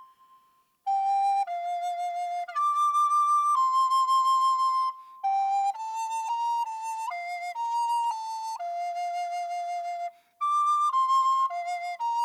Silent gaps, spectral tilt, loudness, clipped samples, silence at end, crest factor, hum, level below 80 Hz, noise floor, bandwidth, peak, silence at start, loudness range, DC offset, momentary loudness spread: none; 3 dB/octave; -27 LUFS; under 0.1%; 0 s; 10 dB; none; under -90 dBFS; -65 dBFS; 15 kHz; -16 dBFS; 0 s; 7 LU; under 0.1%; 10 LU